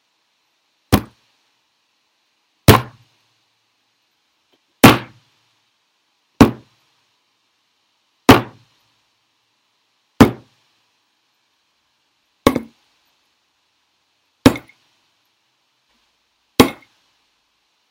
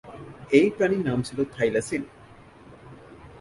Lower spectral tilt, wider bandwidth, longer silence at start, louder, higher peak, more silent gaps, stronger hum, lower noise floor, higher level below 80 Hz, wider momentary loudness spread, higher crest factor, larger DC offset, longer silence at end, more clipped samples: about the same, -5.5 dB/octave vs -6 dB/octave; first, 16 kHz vs 11.5 kHz; first, 0.9 s vs 0.05 s; first, -15 LUFS vs -24 LUFS; first, 0 dBFS vs -4 dBFS; neither; neither; first, -66 dBFS vs -49 dBFS; first, -40 dBFS vs -56 dBFS; first, 25 LU vs 22 LU; about the same, 20 dB vs 22 dB; neither; first, 1.2 s vs 0.05 s; first, 0.3% vs under 0.1%